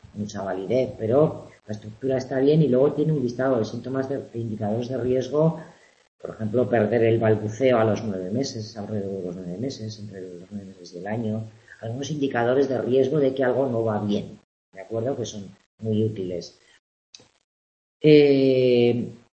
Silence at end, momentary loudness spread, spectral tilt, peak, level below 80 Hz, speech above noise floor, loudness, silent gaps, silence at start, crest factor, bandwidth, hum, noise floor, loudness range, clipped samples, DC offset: 0.2 s; 18 LU; -7 dB/octave; -4 dBFS; -60 dBFS; over 67 dB; -23 LUFS; 6.08-6.19 s, 14.44-14.72 s, 15.66-15.78 s, 16.79-17.13 s, 17.44-18.00 s; 0.15 s; 20 dB; 8.4 kHz; none; under -90 dBFS; 8 LU; under 0.1%; under 0.1%